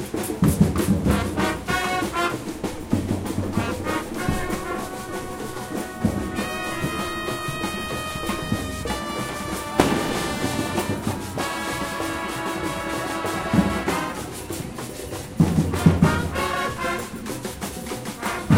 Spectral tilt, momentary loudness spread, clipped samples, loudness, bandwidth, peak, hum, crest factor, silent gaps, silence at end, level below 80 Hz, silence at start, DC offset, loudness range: -5 dB/octave; 11 LU; under 0.1%; -25 LUFS; 16 kHz; -2 dBFS; none; 24 dB; none; 0 s; -40 dBFS; 0 s; under 0.1%; 4 LU